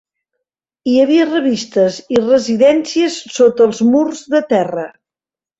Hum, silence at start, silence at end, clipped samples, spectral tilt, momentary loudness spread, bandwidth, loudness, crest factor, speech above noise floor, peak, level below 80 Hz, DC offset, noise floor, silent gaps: none; 0.85 s; 0.7 s; under 0.1%; -5 dB/octave; 7 LU; 8.2 kHz; -14 LUFS; 12 dB; over 77 dB; -2 dBFS; -58 dBFS; under 0.1%; under -90 dBFS; none